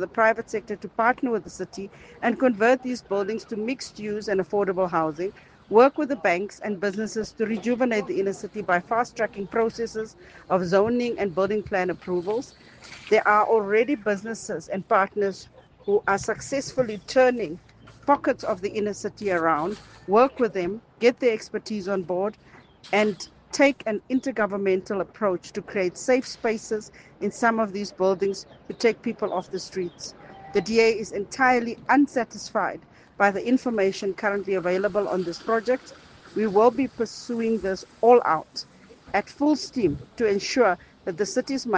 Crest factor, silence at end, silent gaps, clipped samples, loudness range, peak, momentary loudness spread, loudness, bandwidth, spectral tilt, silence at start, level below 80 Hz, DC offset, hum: 20 dB; 0 s; none; under 0.1%; 3 LU; -4 dBFS; 11 LU; -24 LUFS; 9.8 kHz; -5 dB/octave; 0 s; -60 dBFS; under 0.1%; none